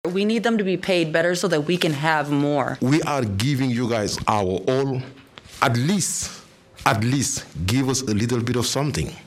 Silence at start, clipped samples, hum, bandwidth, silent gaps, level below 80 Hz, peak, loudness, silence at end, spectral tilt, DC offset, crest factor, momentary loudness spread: 0.05 s; under 0.1%; none; 16 kHz; none; -48 dBFS; 0 dBFS; -22 LUFS; 0.05 s; -4.5 dB/octave; under 0.1%; 22 dB; 5 LU